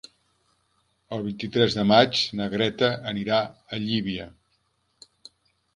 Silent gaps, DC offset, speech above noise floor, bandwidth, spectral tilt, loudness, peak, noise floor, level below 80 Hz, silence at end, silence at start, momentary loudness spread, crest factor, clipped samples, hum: none; under 0.1%; 46 dB; 10.5 kHz; -5.5 dB/octave; -24 LUFS; -2 dBFS; -70 dBFS; -58 dBFS; 1.45 s; 1.1 s; 14 LU; 24 dB; under 0.1%; none